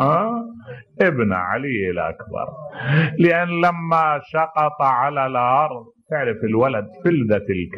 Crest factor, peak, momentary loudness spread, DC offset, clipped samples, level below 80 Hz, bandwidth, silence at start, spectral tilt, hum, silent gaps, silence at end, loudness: 14 dB; -4 dBFS; 12 LU; under 0.1%; under 0.1%; -56 dBFS; 6.4 kHz; 0 s; -9 dB/octave; none; none; 0 s; -20 LUFS